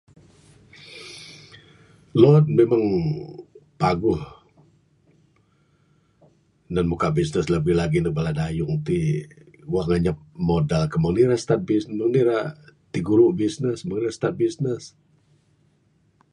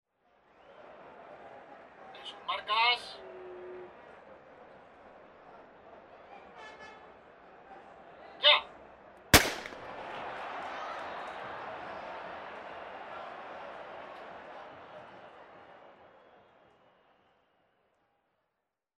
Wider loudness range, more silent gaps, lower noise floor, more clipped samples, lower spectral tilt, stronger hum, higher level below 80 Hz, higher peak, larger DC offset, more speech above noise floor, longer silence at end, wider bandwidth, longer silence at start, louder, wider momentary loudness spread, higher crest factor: second, 8 LU vs 24 LU; neither; second, -63 dBFS vs -85 dBFS; neither; first, -7.5 dB/octave vs -2 dB/octave; neither; first, -46 dBFS vs -54 dBFS; first, -2 dBFS vs -10 dBFS; neither; second, 42 dB vs 53 dB; second, 1.45 s vs 2.6 s; second, 11 kHz vs 13 kHz; first, 0.85 s vs 0.65 s; first, -22 LUFS vs -31 LUFS; second, 15 LU vs 28 LU; second, 22 dB vs 28 dB